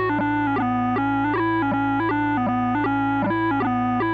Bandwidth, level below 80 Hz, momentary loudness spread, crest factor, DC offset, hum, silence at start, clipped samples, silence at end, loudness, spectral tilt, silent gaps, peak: 5 kHz; -46 dBFS; 1 LU; 8 dB; under 0.1%; none; 0 s; under 0.1%; 0 s; -22 LUFS; -8.5 dB/octave; none; -14 dBFS